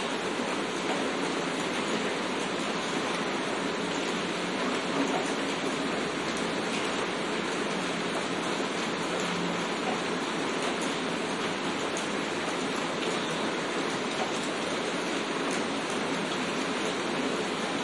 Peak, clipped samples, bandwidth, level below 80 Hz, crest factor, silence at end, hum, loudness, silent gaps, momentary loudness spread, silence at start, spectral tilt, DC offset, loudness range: -16 dBFS; under 0.1%; 11.5 kHz; -68 dBFS; 14 dB; 0 s; none; -30 LUFS; none; 1 LU; 0 s; -3.5 dB/octave; under 0.1%; 0 LU